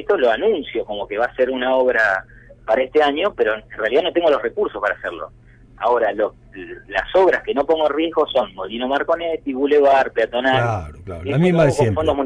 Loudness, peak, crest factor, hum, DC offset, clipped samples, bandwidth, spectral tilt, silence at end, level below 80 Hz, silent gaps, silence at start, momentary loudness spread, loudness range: -19 LUFS; -4 dBFS; 14 dB; none; under 0.1%; under 0.1%; 11 kHz; -6.5 dB/octave; 0 s; -46 dBFS; none; 0 s; 11 LU; 3 LU